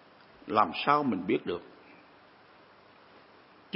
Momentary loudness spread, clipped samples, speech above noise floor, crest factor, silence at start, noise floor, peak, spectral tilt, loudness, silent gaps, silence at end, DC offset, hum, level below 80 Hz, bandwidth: 13 LU; under 0.1%; 29 dB; 24 dB; 0.5 s; -57 dBFS; -10 dBFS; -9 dB/octave; -29 LUFS; none; 0 s; under 0.1%; none; -72 dBFS; 5.8 kHz